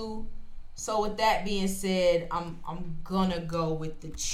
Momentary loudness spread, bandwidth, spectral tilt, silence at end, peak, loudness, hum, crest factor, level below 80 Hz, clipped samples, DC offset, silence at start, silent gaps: 13 LU; 15.5 kHz; -4.5 dB/octave; 0 s; -12 dBFS; -30 LUFS; none; 16 dB; -42 dBFS; under 0.1%; under 0.1%; 0 s; none